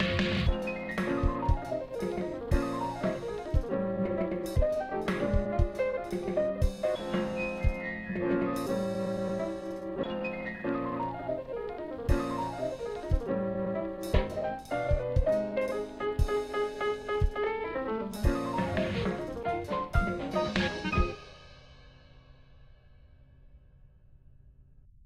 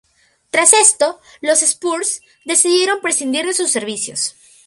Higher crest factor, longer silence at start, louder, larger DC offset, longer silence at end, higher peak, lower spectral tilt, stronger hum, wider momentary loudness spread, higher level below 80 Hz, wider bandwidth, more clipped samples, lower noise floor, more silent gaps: first, 22 dB vs 16 dB; second, 0 s vs 0.55 s; second, -32 LUFS vs -14 LUFS; neither; second, 0 s vs 0.35 s; second, -10 dBFS vs 0 dBFS; first, -7 dB/octave vs 0 dB/octave; neither; second, 6 LU vs 12 LU; first, -38 dBFS vs -68 dBFS; about the same, 15 kHz vs 15.5 kHz; neither; first, -57 dBFS vs -43 dBFS; neither